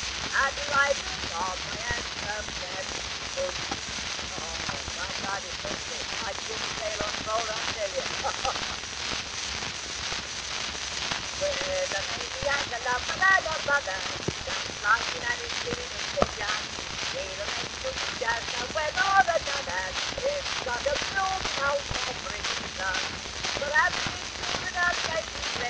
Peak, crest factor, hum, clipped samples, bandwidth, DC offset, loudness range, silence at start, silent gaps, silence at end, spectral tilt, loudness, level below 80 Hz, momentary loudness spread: -6 dBFS; 24 dB; none; under 0.1%; 11 kHz; under 0.1%; 5 LU; 0 s; none; 0 s; -1.5 dB/octave; -28 LUFS; -48 dBFS; 7 LU